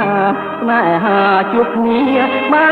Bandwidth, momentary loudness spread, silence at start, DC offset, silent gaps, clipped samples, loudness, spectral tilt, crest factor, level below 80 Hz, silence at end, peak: 4.9 kHz; 4 LU; 0 s; under 0.1%; none; under 0.1%; -13 LUFS; -7.5 dB/octave; 12 dB; -54 dBFS; 0 s; -2 dBFS